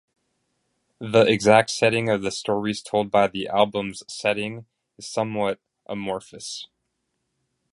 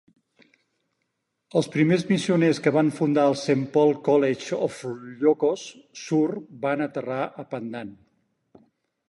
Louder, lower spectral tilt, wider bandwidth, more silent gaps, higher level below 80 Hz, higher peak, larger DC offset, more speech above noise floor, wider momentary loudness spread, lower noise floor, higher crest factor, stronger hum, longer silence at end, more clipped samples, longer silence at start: about the same, -22 LUFS vs -24 LUFS; second, -4.5 dB/octave vs -6.5 dB/octave; about the same, 11.5 kHz vs 11.5 kHz; neither; first, -60 dBFS vs -70 dBFS; first, -2 dBFS vs -8 dBFS; neither; about the same, 54 dB vs 55 dB; first, 18 LU vs 14 LU; about the same, -76 dBFS vs -78 dBFS; about the same, 22 dB vs 18 dB; neither; about the same, 1.1 s vs 1.15 s; neither; second, 1 s vs 1.55 s